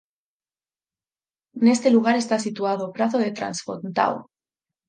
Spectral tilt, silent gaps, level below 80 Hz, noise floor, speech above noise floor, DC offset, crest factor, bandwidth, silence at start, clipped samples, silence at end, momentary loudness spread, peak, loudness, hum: -5 dB/octave; none; -72 dBFS; under -90 dBFS; over 69 dB; under 0.1%; 20 dB; 9.8 kHz; 1.55 s; under 0.1%; 0.65 s; 11 LU; -4 dBFS; -22 LUFS; none